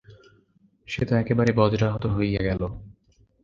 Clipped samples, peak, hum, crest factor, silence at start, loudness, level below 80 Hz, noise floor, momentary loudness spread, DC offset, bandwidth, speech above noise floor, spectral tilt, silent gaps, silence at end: under 0.1%; -4 dBFS; none; 22 dB; 0.1 s; -24 LUFS; -42 dBFS; -62 dBFS; 12 LU; under 0.1%; 7.2 kHz; 39 dB; -8 dB/octave; none; 0.5 s